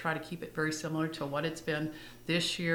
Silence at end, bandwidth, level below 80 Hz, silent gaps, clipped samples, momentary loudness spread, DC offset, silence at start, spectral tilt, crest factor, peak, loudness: 0 s; over 20 kHz; -62 dBFS; none; under 0.1%; 8 LU; under 0.1%; 0 s; -4.5 dB/octave; 18 dB; -16 dBFS; -34 LUFS